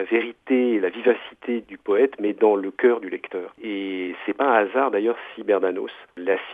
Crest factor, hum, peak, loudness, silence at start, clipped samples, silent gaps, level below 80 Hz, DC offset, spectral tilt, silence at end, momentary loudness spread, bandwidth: 18 dB; none; -4 dBFS; -23 LUFS; 0 s; under 0.1%; none; -74 dBFS; under 0.1%; -7 dB/octave; 0 s; 11 LU; 3.8 kHz